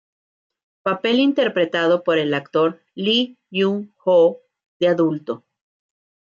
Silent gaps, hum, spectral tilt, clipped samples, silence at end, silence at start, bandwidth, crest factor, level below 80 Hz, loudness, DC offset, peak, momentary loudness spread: 4.66-4.80 s; none; -6.5 dB/octave; under 0.1%; 0.95 s; 0.85 s; 7.2 kHz; 14 dB; -72 dBFS; -19 LUFS; under 0.1%; -6 dBFS; 10 LU